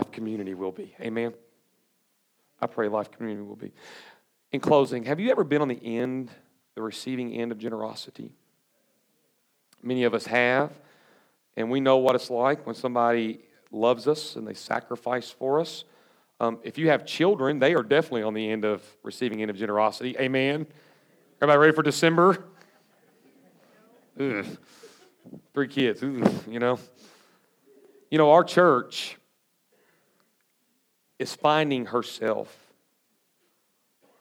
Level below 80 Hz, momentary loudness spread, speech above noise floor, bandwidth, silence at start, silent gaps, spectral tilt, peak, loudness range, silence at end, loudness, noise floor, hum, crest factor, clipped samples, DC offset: -82 dBFS; 16 LU; 46 dB; 16.5 kHz; 0 s; none; -5.5 dB/octave; -4 dBFS; 10 LU; 1.75 s; -25 LUFS; -71 dBFS; none; 22 dB; under 0.1%; under 0.1%